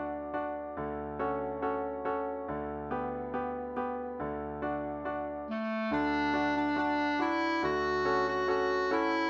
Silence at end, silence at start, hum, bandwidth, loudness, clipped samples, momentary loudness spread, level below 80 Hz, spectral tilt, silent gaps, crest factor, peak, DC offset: 0 s; 0 s; none; 7.4 kHz; -33 LUFS; under 0.1%; 8 LU; -54 dBFS; -6 dB/octave; none; 14 dB; -18 dBFS; under 0.1%